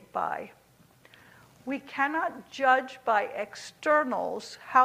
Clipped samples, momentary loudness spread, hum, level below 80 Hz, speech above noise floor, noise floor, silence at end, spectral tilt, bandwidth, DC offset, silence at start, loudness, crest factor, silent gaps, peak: under 0.1%; 14 LU; none; -74 dBFS; 31 dB; -59 dBFS; 0 s; -3.5 dB/octave; 15.5 kHz; under 0.1%; 0.15 s; -29 LUFS; 22 dB; none; -8 dBFS